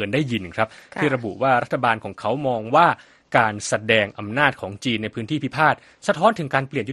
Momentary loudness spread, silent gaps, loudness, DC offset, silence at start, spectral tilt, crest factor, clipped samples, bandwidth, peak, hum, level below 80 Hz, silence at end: 7 LU; none; -21 LUFS; under 0.1%; 0 s; -5 dB/octave; 20 dB; under 0.1%; 12.5 kHz; 0 dBFS; none; -58 dBFS; 0 s